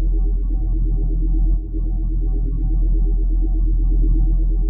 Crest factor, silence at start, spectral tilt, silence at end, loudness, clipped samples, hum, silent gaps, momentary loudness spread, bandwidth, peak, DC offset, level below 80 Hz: 8 dB; 0 s; -15 dB/octave; 0 s; -22 LUFS; under 0.1%; none; none; 4 LU; 1.2 kHz; -8 dBFS; under 0.1%; -16 dBFS